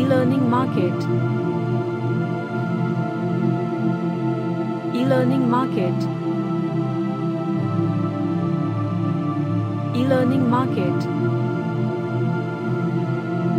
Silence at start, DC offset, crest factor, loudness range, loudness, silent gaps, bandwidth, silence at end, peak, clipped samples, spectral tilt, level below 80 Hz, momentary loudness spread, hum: 0 s; under 0.1%; 14 dB; 2 LU; -22 LUFS; none; 10 kHz; 0 s; -6 dBFS; under 0.1%; -9 dB/octave; -64 dBFS; 5 LU; none